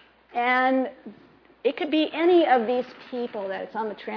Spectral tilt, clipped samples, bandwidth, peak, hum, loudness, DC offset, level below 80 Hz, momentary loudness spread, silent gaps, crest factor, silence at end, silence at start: -6.5 dB/octave; under 0.1%; 5.4 kHz; -8 dBFS; none; -24 LUFS; under 0.1%; -72 dBFS; 13 LU; none; 18 dB; 0 s; 0.35 s